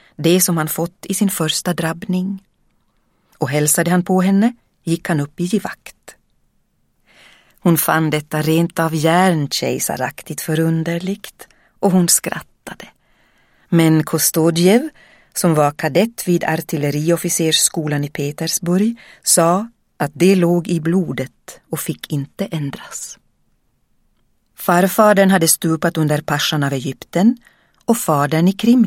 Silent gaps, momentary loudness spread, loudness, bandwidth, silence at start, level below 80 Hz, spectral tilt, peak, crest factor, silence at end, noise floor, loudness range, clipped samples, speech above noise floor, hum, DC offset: none; 13 LU; -17 LUFS; 16.5 kHz; 0.2 s; -56 dBFS; -4.5 dB/octave; 0 dBFS; 18 dB; 0 s; -62 dBFS; 5 LU; under 0.1%; 46 dB; none; under 0.1%